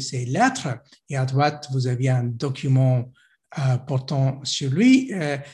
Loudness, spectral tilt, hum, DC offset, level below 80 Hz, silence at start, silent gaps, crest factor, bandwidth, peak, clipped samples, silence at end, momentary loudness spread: -22 LUFS; -6 dB/octave; none; under 0.1%; -60 dBFS; 0 s; none; 16 dB; 10.5 kHz; -6 dBFS; under 0.1%; 0 s; 11 LU